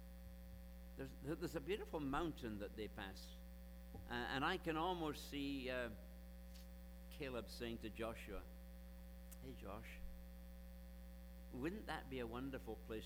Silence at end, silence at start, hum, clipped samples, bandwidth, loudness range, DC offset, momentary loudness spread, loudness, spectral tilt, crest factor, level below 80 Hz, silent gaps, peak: 0 s; 0 s; none; under 0.1%; over 20 kHz; 8 LU; under 0.1%; 16 LU; -49 LUFS; -5.5 dB/octave; 22 dB; -56 dBFS; none; -28 dBFS